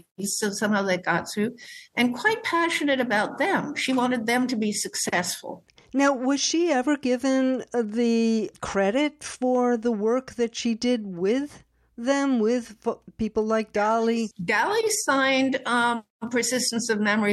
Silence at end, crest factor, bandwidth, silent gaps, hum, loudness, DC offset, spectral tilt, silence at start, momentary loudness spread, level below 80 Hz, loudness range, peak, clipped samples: 0 s; 18 dB; 12.5 kHz; 16.10-16.20 s; none; -24 LUFS; under 0.1%; -3.5 dB/octave; 0.2 s; 7 LU; -60 dBFS; 2 LU; -8 dBFS; under 0.1%